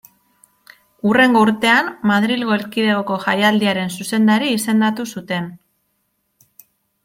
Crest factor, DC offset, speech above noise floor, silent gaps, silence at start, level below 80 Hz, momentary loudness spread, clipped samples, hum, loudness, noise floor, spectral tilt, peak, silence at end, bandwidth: 16 dB; under 0.1%; 52 dB; none; 1.05 s; -62 dBFS; 11 LU; under 0.1%; none; -16 LUFS; -68 dBFS; -4.5 dB/octave; -2 dBFS; 1.5 s; 16.5 kHz